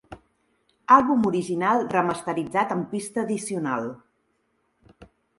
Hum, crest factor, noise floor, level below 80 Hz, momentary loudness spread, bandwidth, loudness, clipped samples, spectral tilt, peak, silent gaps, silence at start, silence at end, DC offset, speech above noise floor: none; 22 dB; -71 dBFS; -62 dBFS; 11 LU; 11.5 kHz; -23 LUFS; under 0.1%; -5.5 dB/octave; -4 dBFS; none; 0.1 s; 0.35 s; under 0.1%; 48 dB